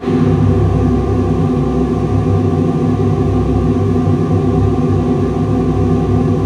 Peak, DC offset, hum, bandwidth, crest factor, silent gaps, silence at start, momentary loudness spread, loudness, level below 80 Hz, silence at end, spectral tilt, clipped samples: 0 dBFS; under 0.1%; none; 9.2 kHz; 12 dB; none; 0 s; 2 LU; -14 LUFS; -24 dBFS; 0 s; -9.5 dB/octave; under 0.1%